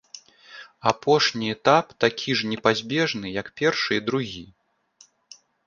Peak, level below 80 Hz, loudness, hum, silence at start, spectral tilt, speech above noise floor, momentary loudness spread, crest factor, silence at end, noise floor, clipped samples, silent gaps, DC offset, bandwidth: -2 dBFS; -62 dBFS; -23 LUFS; none; 0.15 s; -4 dB/octave; 35 dB; 14 LU; 22 dB; 1.2 s; -58 dBFS; under 0.1%; none; under 0.1%; 7.4 kHz